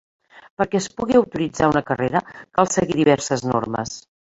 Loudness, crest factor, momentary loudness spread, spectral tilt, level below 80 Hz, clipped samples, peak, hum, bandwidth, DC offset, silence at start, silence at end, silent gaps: -20 LUFS; 20 dB; 8 LU; -5 dB/octave; -50 dBFS; under 0.1%; -2 dBFS; none; 8 kHz; under 0.1%; 0.35 s; 0.35 s; 0.50-0.57 s